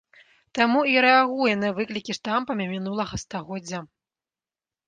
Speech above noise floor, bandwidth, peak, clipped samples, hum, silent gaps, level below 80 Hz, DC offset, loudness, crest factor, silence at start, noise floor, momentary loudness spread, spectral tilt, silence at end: over 67 dB; 9.4 kHz; -4 dBFS; under 0.1%; none; none; -56 dBFS; under 0.1%; -23 LUFS; 20 dB; 0.55 s; under -90 dBFS; 15 LU; -4.5 dB/octave; 1.05 s